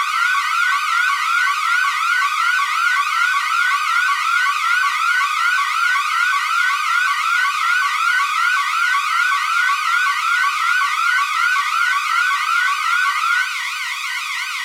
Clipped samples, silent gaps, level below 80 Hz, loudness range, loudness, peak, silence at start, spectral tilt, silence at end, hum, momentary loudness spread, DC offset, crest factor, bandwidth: under 0.1%; none; under -90 dBFS; 0 LU; -16 LUFS; -6 dBFS; 0 s; 13.5 dB/octave; 0 s; none; 1 LU; under 0.1%; 12 dB; 16 kHz